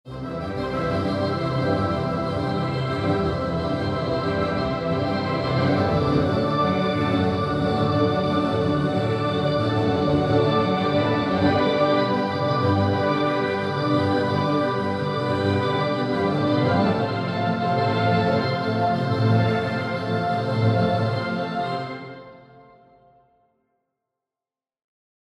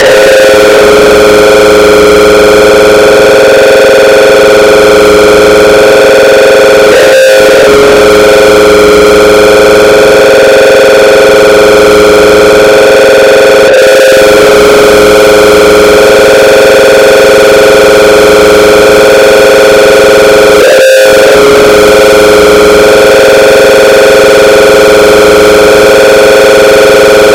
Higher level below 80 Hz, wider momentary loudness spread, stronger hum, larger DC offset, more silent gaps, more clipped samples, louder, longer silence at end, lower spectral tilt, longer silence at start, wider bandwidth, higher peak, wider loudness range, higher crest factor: second, -46 dBFS vs -26 dBFS; first, 5 LU vs 0 LU; neither; neither; neither; second, under 0.1% vs 30%; second, -22 LUFS vs -1 LUFS; first, 3 s vs 0 s; first, -7.5 dB/octave vs -3 dB/octave; about the same, 0.05 s vs 0 s; second, 10.5 kHz vs 18.5 kHz; second, -6 dBFS vs 0 dBFS; first, 4 LU vs 0 LU; first, 16 dB vs 0 dB